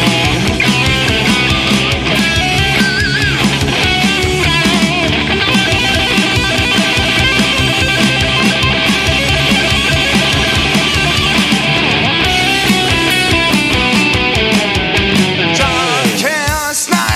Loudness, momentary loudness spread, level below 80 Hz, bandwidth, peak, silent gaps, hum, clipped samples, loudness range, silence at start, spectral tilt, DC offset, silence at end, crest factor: -11 LUFS; 2 LU; -26 dBFS; 16 kHz; 0 dBFS; none; none; under 0.1%; 1 LU; 0 s; -3.5 dB/octave; under 0.1%; 0 s; 12 dB